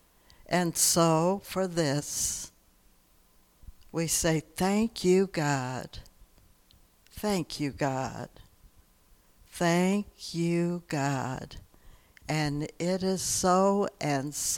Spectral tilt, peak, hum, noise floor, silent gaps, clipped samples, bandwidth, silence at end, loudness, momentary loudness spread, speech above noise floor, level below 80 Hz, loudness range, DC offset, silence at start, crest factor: -4.5 dB/octave; -12 dBFS; none; -63 dBFS; none; under 0.1%; 19 kHz; 0 s; -28 LUFS; 14 LU; 34 dB; -54 dBFS; 6 LU; under 0.1%; 0.5 s; 18 dB